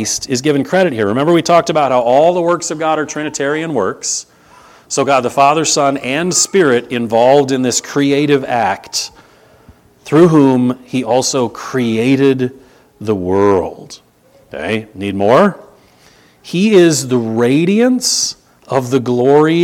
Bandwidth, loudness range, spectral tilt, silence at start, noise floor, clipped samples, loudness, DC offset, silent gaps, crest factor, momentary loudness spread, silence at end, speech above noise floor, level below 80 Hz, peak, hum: 16.5 kHz; 4 LU; -4.5 dB/octave; 0 s; -48 dBFS; under 0.1%; -13 LUFS; under 0.1%; none; 14 dB; 10 LU; 0 s; 36 dB; -54 dBFS; 0 dBFS; none